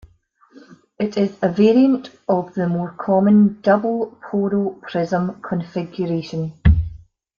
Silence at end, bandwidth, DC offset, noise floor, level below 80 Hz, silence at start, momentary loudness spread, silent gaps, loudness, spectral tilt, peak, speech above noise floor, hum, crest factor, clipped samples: 0.4 s; 7 kHz; under 0.1%; -56 dBFS; -32 dBFS; 0.55 s; 11 LU; none; -19 LUFS; -9 dB/octave; -2 dBFS; 37 dB; none; 16 dB; under 0.1%